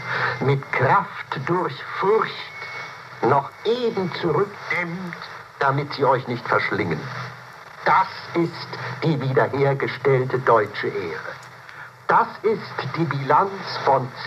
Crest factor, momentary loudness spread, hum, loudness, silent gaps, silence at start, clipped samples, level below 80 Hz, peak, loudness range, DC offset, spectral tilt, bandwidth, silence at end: 18 dB; 14 LU; none; -22 LUFS; none; 0 s; under 0.1%; -66 dBFS; -4 dBFS; 2 LU; under 0.1%; -7 dB/octave; 13 kHz; 0 s